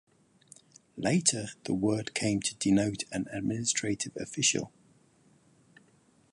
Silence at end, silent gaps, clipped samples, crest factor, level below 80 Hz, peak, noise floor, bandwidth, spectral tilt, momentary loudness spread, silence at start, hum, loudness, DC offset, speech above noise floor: 1.65 s; none; under 0.1%; 24 dB; -62 dBFS; -8 dBFS; -65 dBFS; 11.5 kHz; -3.5 dB/octave; 9 LU; 0.95 s; none; -30 LUFS; under 0.1%; 35 dB